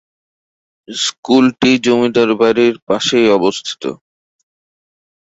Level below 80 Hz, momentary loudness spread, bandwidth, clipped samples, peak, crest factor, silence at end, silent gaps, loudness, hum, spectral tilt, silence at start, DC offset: -56 dBFS; 11 LU; 8.2 kHz; under 0.1%; -2 dBFS; 14 dB; 1.35 s; 1.18-1.23 s, 2.82-2.87 s; -13 LUFS; none; -4 dB/octave; 0.9 s; under 0.1%